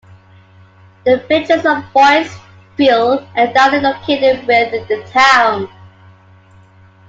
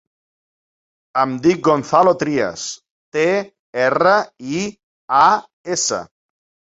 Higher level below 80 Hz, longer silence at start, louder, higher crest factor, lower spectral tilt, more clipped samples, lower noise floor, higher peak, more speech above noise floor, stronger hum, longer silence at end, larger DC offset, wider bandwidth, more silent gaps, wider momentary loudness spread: about the same, -56 dBFS vs -58 dBFS; about the same, 1.05 s vs 1.15 s; first, -12 LUFS vs -17 LUFS; about the same, 14 dB vs 18 dB; about the same, -4 dB/octave vs -4 dB/octave; neither; second, -44 dBFS vs under -90 dBFS; about the same, 0 dBFS vs -2 dBFS; second, 32 dB vs over 73 dB; neither; first, 1.4 s vs 0.65 s; neither; about the same, 9 kHz vs 8.2 kHz; second, none vs 2.91-3.12 s, 3.59-3.73 s, 4.83-5.08 s, 5.53-5.64 s; about the same, 11 LU vs 13 LU